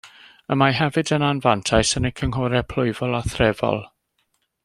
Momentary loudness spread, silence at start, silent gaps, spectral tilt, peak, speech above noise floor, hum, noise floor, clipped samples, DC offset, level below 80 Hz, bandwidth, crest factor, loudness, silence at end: 6 LU; 0.05 s; none; -5 dB/octave; -2 dBFS; 50 dB; none; -70 dBFS; under 0.1%; under 0.1%; -40 dBFS; 12.5 kHz; 20 dB; -21 LUFS; 0.75 s